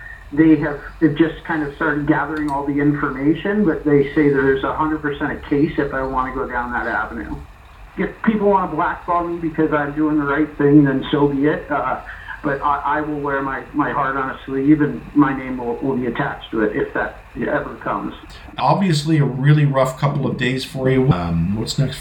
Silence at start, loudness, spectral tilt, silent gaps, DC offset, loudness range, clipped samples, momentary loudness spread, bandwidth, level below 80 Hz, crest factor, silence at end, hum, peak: 0 s; -19 LUFS; -7.5 dB/octave; none; under 0.1%; 4 LU; under 0.1%; 9 LU; 12.5 kHz; -40 dBFS; 18 dB; 0 s; none; -2 dBFS